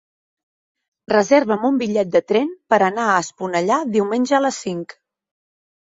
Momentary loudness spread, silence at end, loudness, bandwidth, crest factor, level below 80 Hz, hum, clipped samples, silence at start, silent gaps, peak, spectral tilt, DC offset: 8 LU; 1.1 s; -18 LUFS; 8 kHz; 18 dB; -64 dBFS; none; under 0.1%; 1.1 s; none; -2 dBFS; -5 dB/octave; under 0.1%